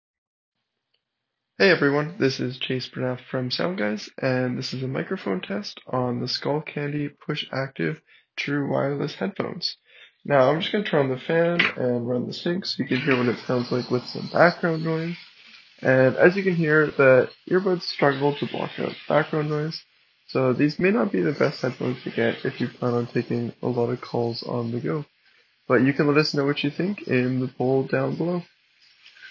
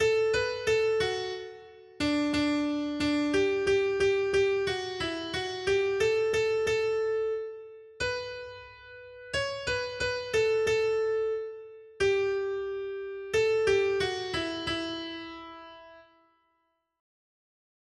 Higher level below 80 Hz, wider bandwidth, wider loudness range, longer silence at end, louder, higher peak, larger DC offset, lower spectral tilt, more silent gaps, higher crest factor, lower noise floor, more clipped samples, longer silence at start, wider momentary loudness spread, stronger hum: second, -66 dBFS vs -56 dBFS; second, 7.2 kHz vs 11.5 kHz; about the same, 7 LU vs 6 LU; second, 0 s vs 2 s; first, -24 LUFS vs -29 LUFS; first, -2 dBFS vs -14 dBFS; neither; first, -7 dB/octave vs -4 dB/octave; neither; first, 22 dB vs 16 dB; first, -81 dBFS vs -76 dBFS; neither; first, 1.6 s vs 0 s; second, 10 LU vs 17 LU; neither